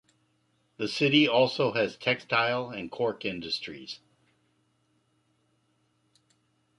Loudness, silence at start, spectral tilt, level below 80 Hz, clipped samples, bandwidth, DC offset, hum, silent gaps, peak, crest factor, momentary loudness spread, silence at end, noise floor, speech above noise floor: -27 LUFS; 0.8 s; -5 dB/octave; -70 dBFS; under 0.1%; 11.5 kHz; under 0.1%; none; none; -8 dBFS; 22 dB; 16 LU; 2.85 s; -72 dBFS; 44 dB